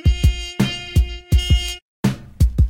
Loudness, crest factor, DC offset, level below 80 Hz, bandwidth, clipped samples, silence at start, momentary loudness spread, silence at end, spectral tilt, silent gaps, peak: -20 LUFS; 14 dB; under 0.1%; -20 dBFS; 16.5 kHz; under 0.1%; 0.05 s; 5 LU; 0 s; -5.5 dB/octave; 1.82-2.03 s; -4 dBFS